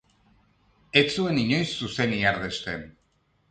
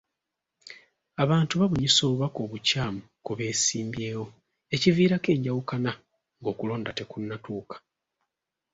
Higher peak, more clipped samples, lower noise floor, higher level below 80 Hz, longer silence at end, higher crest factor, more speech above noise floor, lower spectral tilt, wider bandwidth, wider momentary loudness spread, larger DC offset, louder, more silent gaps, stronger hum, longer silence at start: about the same, -6 dBFS vs -8 dBFS; neither; second, -68 dBFS vs -85 dBFS; about the same, -54 dBFS vs -58 dBFS; second, 0.6 s vs 0.95 s; about the same, 22 dB vs 20 dB; second, 43 dB vs 59 dB; about the same, -5 dB/octave vs -4.5 dB/octave; first, 9.4 kHz vs 8 kHz; second, 10 LU vs 20 LU; neither; about the same, -25 LUFS vs -26 LUFS; neither; neither; first, 0.95 s vs 0.65 s